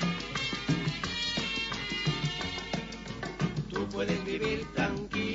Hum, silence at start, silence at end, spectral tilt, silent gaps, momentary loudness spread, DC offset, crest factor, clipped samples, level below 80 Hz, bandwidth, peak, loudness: none; 0 s; 0 s; -5 dB/octave; none; 5 LU; under 0.1%; 16 dB; under 0.1%; -50 dBFS; 8 kHz; -16 dBFS; -32 LUFS